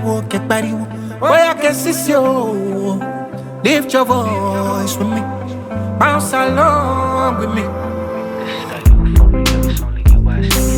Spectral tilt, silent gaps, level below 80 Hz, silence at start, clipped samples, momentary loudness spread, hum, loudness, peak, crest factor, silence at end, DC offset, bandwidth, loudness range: -5.5 dB/octave; none; -18 dBFS; 0 s; under 0.1%; 11 LU; none; -15 LUFS; 0 dBFS; 14 dB; 0 s; under 0.1%; 19.5 kHz; 2 LU